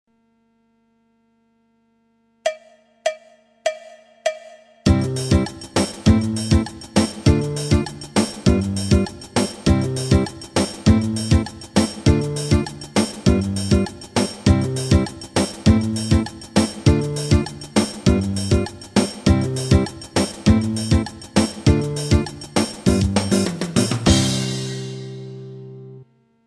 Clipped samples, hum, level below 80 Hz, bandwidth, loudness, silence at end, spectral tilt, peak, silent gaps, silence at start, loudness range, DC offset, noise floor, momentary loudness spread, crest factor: under 0.1%; 50 Hz at -40 dBFS; -30 dBFS; 13.5 kHz; -20 LUFS; 0.45 s; -5.5 dB/octave; -4 dBFS; none; 2.45 s; 5 LU; under 0.1%; -63 dBFS; 9 LU; 16 dB